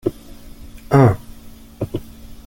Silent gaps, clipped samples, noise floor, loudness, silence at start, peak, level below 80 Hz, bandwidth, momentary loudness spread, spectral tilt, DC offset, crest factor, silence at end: none; under 0.1%; -39 dBFS; -18 LUFS; 0.05 s; -2 dBFS; -40 dBFS; 17 kHz; 16 LU; -8.5 dB/octave; under 0.1%; 18 dB; 0.1 s